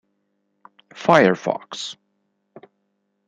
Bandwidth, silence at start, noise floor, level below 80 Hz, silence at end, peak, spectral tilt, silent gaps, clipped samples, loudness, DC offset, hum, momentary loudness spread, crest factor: 11 kHz; 0.95 s; -72 dBFS; -66 dBFS; 1.35 s; -2 dBFS; -5 dB/octave; none; under 0.1%; -19 LUFS; under 0.1%; 50 Hz at -55 dBFS; 16 LU; 22 dB